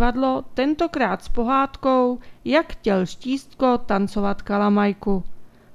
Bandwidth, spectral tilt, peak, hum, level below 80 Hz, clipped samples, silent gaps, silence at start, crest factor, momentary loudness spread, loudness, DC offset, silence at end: 11 kHz; -7 dB/octave; -4 dBFS; none; -38 dBFS; under 0.1%; none; 0 s; 16 dB; 6 LU; -22 LUFS; under 0.1%; 0 s